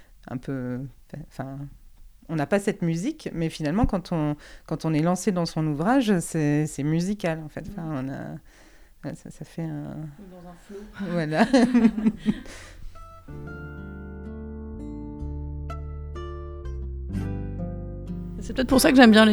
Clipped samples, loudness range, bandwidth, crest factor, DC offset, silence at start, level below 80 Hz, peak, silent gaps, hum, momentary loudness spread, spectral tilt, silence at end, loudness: under 0.1%; 12 LU; 19.5 kHz; 24 dB; under 0.1%; 0 s; -40 dBFS; 0 dBFS; none; none; 20 LU; -5.5 dB/octave; 0 s; -25 LUFS